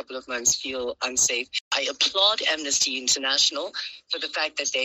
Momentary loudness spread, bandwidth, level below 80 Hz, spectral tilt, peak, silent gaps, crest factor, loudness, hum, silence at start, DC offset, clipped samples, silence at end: 11 LU; 15.5 kHz; -62 dBFS; 1 dB/octave; -8 dBFS; 1.61-1.71 s; 18 dB; -23 LUFS; none; 0 s; under 0.1%; under 0.1%; 0 s